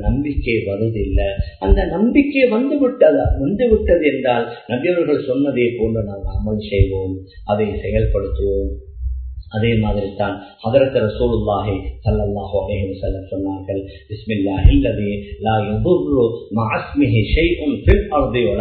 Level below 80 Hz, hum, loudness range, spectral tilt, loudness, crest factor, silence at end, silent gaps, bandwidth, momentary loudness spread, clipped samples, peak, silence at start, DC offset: -24 dBFS; none; 5 LU; -11 dB/octave; -18 LUFS; 18 dB; 0 s; none; 4.5 kHz; 10 LU; under 0.1%; 0 dBFS; 0 s; under 0.1%